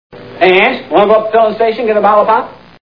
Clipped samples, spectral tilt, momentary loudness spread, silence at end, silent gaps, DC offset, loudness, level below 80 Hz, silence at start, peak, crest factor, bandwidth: 0.5%; -7 dB/octave; 5 LU; 0.25 s; none; 0.4%; -10 LUFS; -50 dBFS; 0.15 s; 0 dBFS; 10 dB; 5.4 kHz